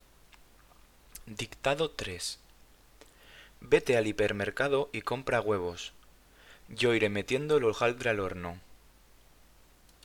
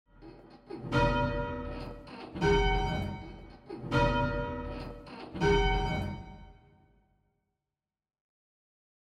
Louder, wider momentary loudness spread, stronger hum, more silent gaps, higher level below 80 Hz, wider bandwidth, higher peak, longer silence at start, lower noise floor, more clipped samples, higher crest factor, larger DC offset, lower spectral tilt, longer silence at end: about the same, -30 LUFS vs -31 LUFS; about the same, 17 LU vs 18 LU; neither; neither; second, -58 dBFS vs -40 dBFS; first, 19 kHz vs 9.8 kHz; first, -10 dBFS vs -14 dBFS; first, 1.15 s vs 0.2 s; second, -59 dBFS vs under -90 dBFS; neither; about the same, 22 dB vs 18 dB; neither; second, -4.5 dB/octave vs -6.5 dB/octave; second, 1.3 s vs 2.5 s